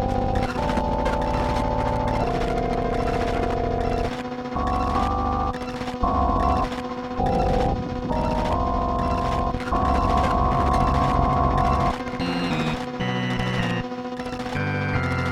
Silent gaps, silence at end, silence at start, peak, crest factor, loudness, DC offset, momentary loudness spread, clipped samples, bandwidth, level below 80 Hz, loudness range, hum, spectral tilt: none; 0 s; 0 s; -6 dBFS; 16 dB; -24 LUFS; under 0.1%; 7 LU; under 0.1%; 13 kHz; -30 dBFS; 3 LU; none; -7 dB/octave